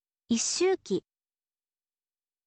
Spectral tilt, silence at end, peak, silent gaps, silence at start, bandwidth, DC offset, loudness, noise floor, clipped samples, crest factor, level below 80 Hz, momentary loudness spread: -3 dB/octave; 1.45 s; -16 dBFS; none; 0.3 s; 8.8 kHz; under 0.1%; -29 LUFS; under -90 dBFS; under 0.1%; 16 dB; -72 dBFS; 8 LU